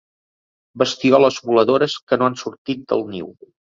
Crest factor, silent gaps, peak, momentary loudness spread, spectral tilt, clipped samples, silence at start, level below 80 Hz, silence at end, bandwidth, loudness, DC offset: 18 dB; 2.02-2.07 s, 2.58-2.65 s; -2 dBFS; 15 LU; -5 dB/octave; under 0.1%; 0.75 s; -60 dBFS; 0.45 s; 7.8 kHz; -18 LUFS; under 0.1%